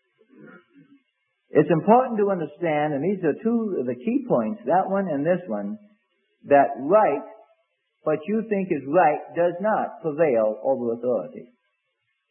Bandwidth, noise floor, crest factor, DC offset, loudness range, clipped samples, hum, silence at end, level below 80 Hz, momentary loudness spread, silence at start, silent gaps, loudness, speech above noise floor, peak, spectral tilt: 3.3 kHz; -75 dBFS; 20 dB; under 0.1%; 2 LU; under 0.1%; none; 0.85 s; -74 dBFS; 8 LU; 0.45 s; none; -23 LUFS; 53 dB; -2 dBFS; -12 dB/octave